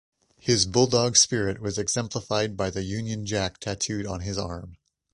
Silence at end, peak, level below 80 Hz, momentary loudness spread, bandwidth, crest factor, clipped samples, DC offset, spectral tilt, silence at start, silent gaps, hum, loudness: 0.4 s; -4 dBFS; -48 dBFS; 12 LU; 11.5 kHz; 22 dB; under 0.1%; under 0.1%; -3.5 dB/octave; 0.45 s; none; none; -25 LUFS